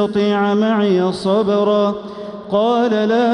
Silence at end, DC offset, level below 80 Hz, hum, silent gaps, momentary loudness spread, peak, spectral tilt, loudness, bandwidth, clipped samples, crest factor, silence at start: 0 s; under 0.1%; -56 dBFS; none; none; 6 LU; -4 dBFS; -7 dB/octave; -16 LUFS; 10.5 kHz; under 0.1%; 10 dB; 0 s